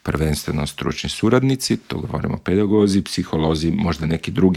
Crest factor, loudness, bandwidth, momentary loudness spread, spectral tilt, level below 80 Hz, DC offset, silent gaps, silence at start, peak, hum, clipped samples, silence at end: 18 dB; -20 LUFS; 16 kHz; 8 LU; -6 dB/octave; -38 dBFS; under 0.1%; none; 0.05 s; -2 dBFS; none; under 0.1%; 0 s